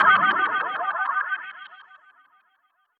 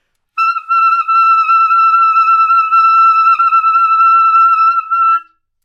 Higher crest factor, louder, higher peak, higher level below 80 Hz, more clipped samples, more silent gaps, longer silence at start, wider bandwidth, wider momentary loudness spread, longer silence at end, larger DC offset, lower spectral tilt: first, 20 dB vs 8 dB; second, -22 LUFS vs -9 LUFS; second, -6 dBFS vs -2 dBFS; second, -80 dBFS vs -68 dBFS; neither; neither; second, 0 s vs 0.35 s; second, 4.8 kHz vs 7 kHz; first, 22 LU vs 5 LU; first, 1.2 s vs 0.45 s; neither; first, -5 dB/octave vs 3 dB/octave